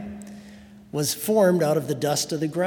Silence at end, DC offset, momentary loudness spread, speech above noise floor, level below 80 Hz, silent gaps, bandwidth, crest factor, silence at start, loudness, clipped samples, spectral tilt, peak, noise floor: 0 s; under 0.1%; 20 LU; 23 dB; -62 dBFS; none; 18 kHz; 18 dB; 0 s; -23 LUFS; under 0.1%; -4.5 dB/octave; -6 dBFS; -46 dBFS